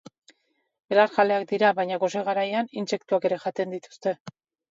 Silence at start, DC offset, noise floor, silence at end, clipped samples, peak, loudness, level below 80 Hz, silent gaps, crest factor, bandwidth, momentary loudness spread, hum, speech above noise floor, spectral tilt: 0.9 s; under 0.1%; -72 dBFS; 0.4 s; under 0.1%; -6 dBFS; -25 LUFS; -78 dBFS; 4.20-4.25 s; 20 dB; 7.8 kHz; 10 LU; none; 48 dB; -5 dB/octave